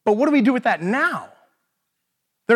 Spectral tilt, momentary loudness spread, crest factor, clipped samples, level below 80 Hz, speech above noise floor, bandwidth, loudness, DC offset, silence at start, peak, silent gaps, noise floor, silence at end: -6.5 dB/octave; 13 LU; 16 dB; under 0.1%; -82 dBFS; 58 dB; 12 kHz; -19 LUFS; under 0.1%; 0.05 s; -4 dBFS; none; -76 dBFS; 0 s